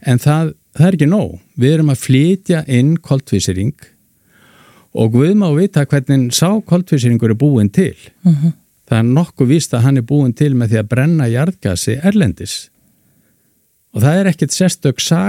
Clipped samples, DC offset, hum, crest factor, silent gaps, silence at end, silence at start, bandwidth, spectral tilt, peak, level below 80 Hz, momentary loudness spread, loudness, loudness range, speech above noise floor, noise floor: under 0.1%; under 0.1%; none; 14 dB; none; 0 s; 0.05 s; 16 kHz; -6.5 dB/octave; 0 dBFS; -48 dBFS; 6 LU; -14 LUFS; 3 LU; 46 dB; -58 dBFS